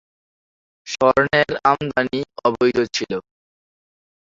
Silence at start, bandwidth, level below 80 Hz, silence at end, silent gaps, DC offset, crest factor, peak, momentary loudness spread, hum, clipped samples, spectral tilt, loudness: 0.85 s; 7.8 kHz; -54 dBFS; 1.15 s; none; under 0.1%; 20 dB; -2 dBFS; 10 LU; none; under 0.1%; -4.5 dB/octave; -19 LUFS